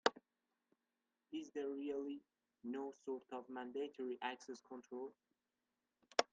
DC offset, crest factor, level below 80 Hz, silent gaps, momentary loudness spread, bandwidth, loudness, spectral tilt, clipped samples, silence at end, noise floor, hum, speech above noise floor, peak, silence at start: under 0.1%; 32 dB; under -90 dBFS; none; 12 LU; 9.4 kHz; -47 LUFS; -2.5 dB/octave; under 0.1%; 0.1 s; under -90 dBFS; none; over 43 dB; -14 dBFS; 0.05 s